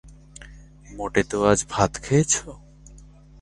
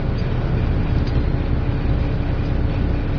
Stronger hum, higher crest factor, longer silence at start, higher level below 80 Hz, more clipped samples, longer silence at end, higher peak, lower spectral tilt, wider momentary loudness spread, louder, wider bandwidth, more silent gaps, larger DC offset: neither; first, 24 dB vs 12 dB; about the same, 0.05 s vs 0 s; second, -44 dBFS vs -22 dBFS; neither; first, 0.4 s vs 0 s; first, -2 dBFS vs -6 dBFS; second, -4.5 dB/octave vs -9.5 dB/octave; first, 24 LU vs 2 LU; about the same, -22 LUFS vs -22 LUFS; first, 11.5 kHz vs 5.4 kHz; neither; neither